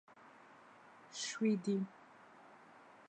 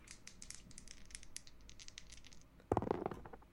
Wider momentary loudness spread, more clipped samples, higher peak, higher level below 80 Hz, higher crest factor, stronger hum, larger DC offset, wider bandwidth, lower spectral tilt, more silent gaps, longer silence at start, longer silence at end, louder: first, 24 LU vs 18 LU; neither; second, -24 dBFS vs -18 dBFS; second, under -90 dBFS vs -60 dBFS; second, 18 dB vs 30 dB; neither; neither; second, 9.2 kHz vs 16.5 kHz; about the same, -5 dB/octave vs -5 dB/octave; neither; about the same, 0.1 s vs 0 s; about the same, 0.05 s vs 0 s; first, -39 LUFS vs -47 LUFS